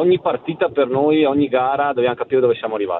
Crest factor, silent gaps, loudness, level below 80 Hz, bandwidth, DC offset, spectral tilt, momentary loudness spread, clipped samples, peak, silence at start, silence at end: 12 dB; none; -18 LUFS; -60 dBFS; 4.1 kHz; under 0.1%; -10.5 dB/octave; 5 LU; under 0.1%; -4 dBFS; 0 s; 0 s